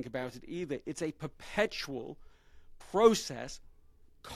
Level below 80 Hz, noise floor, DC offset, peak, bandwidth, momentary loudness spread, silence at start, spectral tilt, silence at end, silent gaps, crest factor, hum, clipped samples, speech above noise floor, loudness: -58 dBFS; -59 dBFS; under 0.1%; -10 dBFS; 15 kHz; 21 LU; 0 s; -4 dB/octave; 0 s; none; 24 dB; none; under 0.1%; 26 dB; -33 LUFS